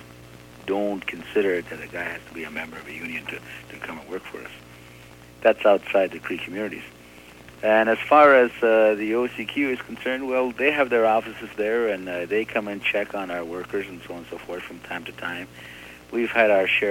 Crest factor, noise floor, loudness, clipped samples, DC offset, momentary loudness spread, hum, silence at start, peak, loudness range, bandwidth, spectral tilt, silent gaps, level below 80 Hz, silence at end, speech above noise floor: 20 dB; -46 dBFS; -23 LUFS; under 0.1%; under 0.1%; 18 LU; 60 Hz at -50 dBFS; 0 s; -4 dBFS; 12 LU; 16.5 kHz; -5 dB/octave; none; -58 dBFS; 0 s; 23 dB